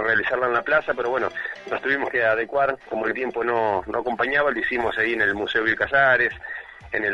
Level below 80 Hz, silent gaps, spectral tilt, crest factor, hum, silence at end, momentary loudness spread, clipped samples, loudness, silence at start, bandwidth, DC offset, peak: -54 dBFS; none; -5.5 dB/octave; 18 dB; none; 0 s; 9 LU; under 0.1%; -22 LUFS; 0 s; 11 kHz; under 0.1%; -4 dBFS